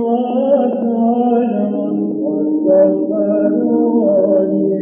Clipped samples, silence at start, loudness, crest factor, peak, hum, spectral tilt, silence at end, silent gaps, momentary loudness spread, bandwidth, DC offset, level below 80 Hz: under 0.1%; 0 s; -15 LUFS; 12 dB; -2 dBFS; none; -13.5 dB/octave; 0 s; none; 6 LU; 3.5 kHz; under 0.1%; -72 dBFS